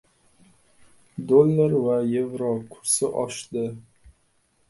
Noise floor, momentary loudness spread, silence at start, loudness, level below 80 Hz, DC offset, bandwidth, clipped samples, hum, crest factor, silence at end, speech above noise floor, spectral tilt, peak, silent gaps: -66 dBFS; 15 LU; 1.15 s; -23 LUFS; -62 dBFS; under 0.1%; 12 kHz; under 0.1%; none; 20 dB; 0.6 s; 44 dB; -5.5 dB/octave; -4 dBFS; none